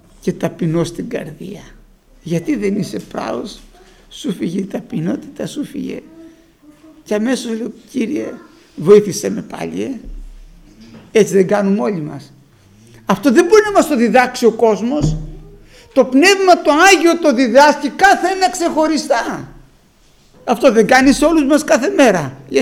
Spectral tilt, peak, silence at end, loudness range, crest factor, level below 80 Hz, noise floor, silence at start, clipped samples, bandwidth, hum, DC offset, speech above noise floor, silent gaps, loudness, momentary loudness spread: -4.5 dB/octave; 0 dBFS; 0 s; 12 LU; 16 dB; -40 dBFS; -50 dBFS; 0.25 s; under 0.1%; 16.5 kHz; none; under 0.1%; 36 dB; none; -14 LUFS; 16 LU